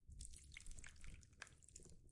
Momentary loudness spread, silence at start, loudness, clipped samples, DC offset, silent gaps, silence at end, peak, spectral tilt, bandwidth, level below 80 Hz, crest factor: 5 LU; 0 s; -60 LUFS; under 0.1%; under 0.1%; none; 0 s; -36 dBFS; -2.5 dB/octave; 11.5 kHz; -62 dBFS; 22 dB